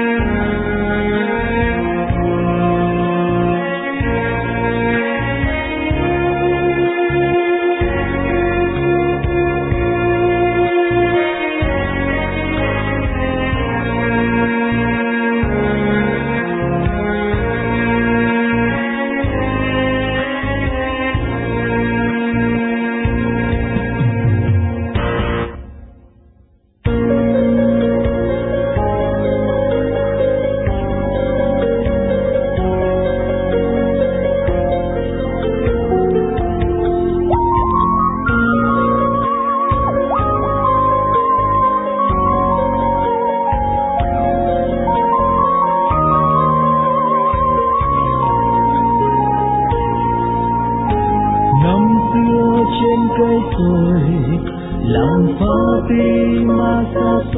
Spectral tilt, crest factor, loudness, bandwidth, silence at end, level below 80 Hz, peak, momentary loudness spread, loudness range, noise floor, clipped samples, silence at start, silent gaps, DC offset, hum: -11.5 dB/octave; 14 dB; -16 LUFS; 4 kHz; 0 s; -28 dBFS; -2 dBFS; 4 LU; 3 LU; -51 dBFS; under 0.1%; 0 s; none; under 0.1%; none